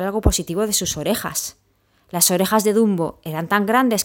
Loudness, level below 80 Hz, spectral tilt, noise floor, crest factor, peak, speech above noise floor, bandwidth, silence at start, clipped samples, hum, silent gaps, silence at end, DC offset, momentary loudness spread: -19 LUFS; -34 dBFS; -3.5 dB/octave; -61 dBFS; 20 dB; 0 dBFS; 42 dB; 16.5 kHz; 0 s; under 0.1%; none; none; 0 s; under 0.1%; 9 LU